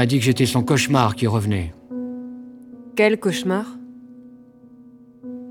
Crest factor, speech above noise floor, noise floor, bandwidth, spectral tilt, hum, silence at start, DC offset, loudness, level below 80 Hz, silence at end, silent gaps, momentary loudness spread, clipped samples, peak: 20 dB; 27 dB; -46 dBFS; 18.5 kHz; -5.5 dB/octave; none; 0 s; under 0.1%; -20 LUFS; -50 dBFS; 0 s; none; 22 LU; under 0.1%; -2 dBFS